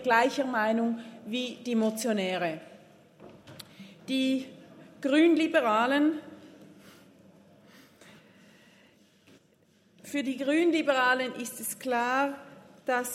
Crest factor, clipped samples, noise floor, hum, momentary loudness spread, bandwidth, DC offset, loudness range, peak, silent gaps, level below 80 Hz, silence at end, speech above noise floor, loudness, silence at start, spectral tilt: 20 dB; under 0.1%; -64 dBFS; none; 20 LU; 16 kHz; under 0.1%; 6 LU; -10 dBFS; none; -82 dBFS; 0 s; 37 dB; -28 LUFS; 0 s; -4 dB/octave